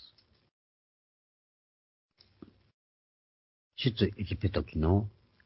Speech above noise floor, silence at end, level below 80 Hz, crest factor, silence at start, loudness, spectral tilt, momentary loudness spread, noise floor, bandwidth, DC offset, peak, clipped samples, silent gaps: 32 dB; 0.35 s; -46 dBFS; 24 dB; 0 s; -31 LUFS; -10.5 dB/octave; 9 LU; -61 dBFS; 5.8 kHz; under 0.1%; -12 dBFS; under 0.1%; 0.51-2.09 s, 2.73-3.71 s